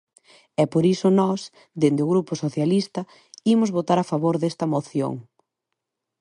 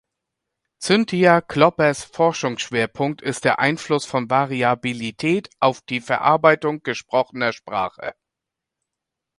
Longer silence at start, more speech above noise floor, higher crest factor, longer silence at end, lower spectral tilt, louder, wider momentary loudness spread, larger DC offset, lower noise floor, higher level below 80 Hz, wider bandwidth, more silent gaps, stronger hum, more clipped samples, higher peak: second, 0.6 s vs 0.8 s; second, 60 dB vs 65 dB; about the same, 18 dB vs 20 dB; second, 1 s vs 1.25 s; first, -7 dB/octave vs -5 dB/octave; about the same, -22 LUFS vs -20 LUFS; about the same, 12 LU vs 10 LU; neither; about the same, -82 dBFS vs -85 dBFS; second, -68 dBFS vs -60 dBFS; about the same, 11 kHz vs 11.5 kHz; neither; neither; neither; second, -6 dBFS vs 0 dBFS